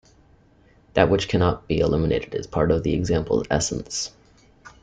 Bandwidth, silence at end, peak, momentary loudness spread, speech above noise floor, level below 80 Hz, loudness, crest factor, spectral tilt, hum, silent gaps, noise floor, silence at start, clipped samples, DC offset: 9.6 kHz; 0.15 s; -4 dBFS; 8 LU; 34 dB; -40 dBFS; -23 LUFS; 20 dB; -5.5 dB/octave; none; none; -56 dBFS; 0.95 s; under 0.1%; under 0.1%